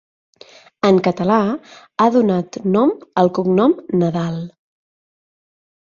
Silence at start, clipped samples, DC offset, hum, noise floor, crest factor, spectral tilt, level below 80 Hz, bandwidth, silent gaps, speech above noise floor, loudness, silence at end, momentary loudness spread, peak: 0.85 s; under 0.1%; under 0.1%; none; -46 dBFS; 16 dB; -8 dB/octave; -58 dBFS; 7.2 kHz; none; 29 dB; -17 LUFS; 1.45 s; 10 LU; -2 dBFS